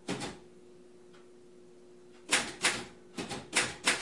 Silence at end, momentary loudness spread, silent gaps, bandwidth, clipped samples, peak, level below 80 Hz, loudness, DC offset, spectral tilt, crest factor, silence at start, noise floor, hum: 0 s; 16 LU; none; 11.5 kHz; under 0.1%; -12 dBFS; -68 dBFS; -32 LUFS; under 0.1%; -1 dB/octave; 26 dB; 0.05 s; -56 dBFS; none